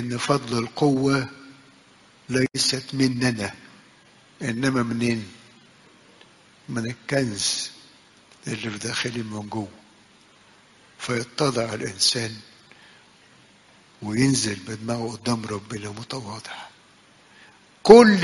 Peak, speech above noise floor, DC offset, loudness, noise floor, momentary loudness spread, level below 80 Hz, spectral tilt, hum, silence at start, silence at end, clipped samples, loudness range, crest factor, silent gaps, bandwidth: 0 dBFS; 32 dB; under 0.1%; -23 LUFS; -54 dBFS; 15 LU; -58 dBFS; -4.5 dB/octave; none; 0 s; 0 s; under 0.1%; 6 LU; 24 dB; none; 11.5 kHz